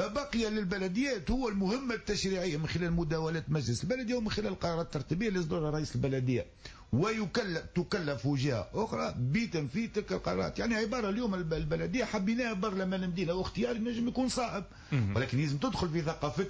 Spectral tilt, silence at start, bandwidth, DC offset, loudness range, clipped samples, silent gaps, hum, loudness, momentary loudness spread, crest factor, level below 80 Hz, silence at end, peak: -6 dB/octave; 0 s; 8 kHz; under 0.1%; 1 LU; under 0.1%; none; none; -33 LUFS; 3 LU; 12 dB; -50 dBFS; 0 s; -20 dBFS